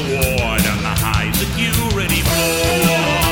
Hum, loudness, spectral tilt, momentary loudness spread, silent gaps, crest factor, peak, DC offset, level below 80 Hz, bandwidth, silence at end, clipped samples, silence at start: none; -16 LUFS; -4 dB/octave; 3 LU; none; 14 dB; -2 dBFS; under 0.1%; -26 dBFS; 17.5 kHz; 0 s; under 0.1%; 0 s